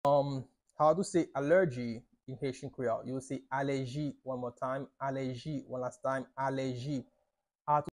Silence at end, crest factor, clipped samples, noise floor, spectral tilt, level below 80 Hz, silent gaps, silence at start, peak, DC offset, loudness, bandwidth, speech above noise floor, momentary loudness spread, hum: 0.05 s; 18 dB; under 0.1%; -82 dBFS; -6.5 dB/octave; -68 dBFS; none; 0.05 s; -16 dBFS; under 0.1%; -34 LUFS; 11.5 kHz; 48 dB; 12 LU; none